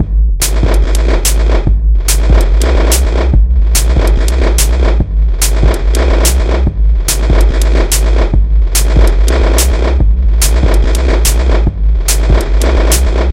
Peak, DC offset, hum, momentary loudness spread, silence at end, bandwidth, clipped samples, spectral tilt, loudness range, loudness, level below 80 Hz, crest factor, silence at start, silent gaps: 0 dBFS; under 0.1%; none; 2 LU; 0 s; 16.5 kHz; 0.2%; -4.5 dB/octave; 1 LU; -11 LUFS; -8 dBFS; 8 dB; 0 s; none